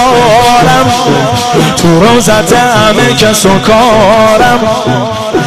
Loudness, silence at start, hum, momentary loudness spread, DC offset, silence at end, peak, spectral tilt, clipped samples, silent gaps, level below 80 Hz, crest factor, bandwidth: -6 LUFS; 0 s; none; 4 LU; under 0.1%; 0 s; 0 dBFS; -4.5 dB/octave; 0.7%; none; -28 dBFS; 6 dB; 15 kHz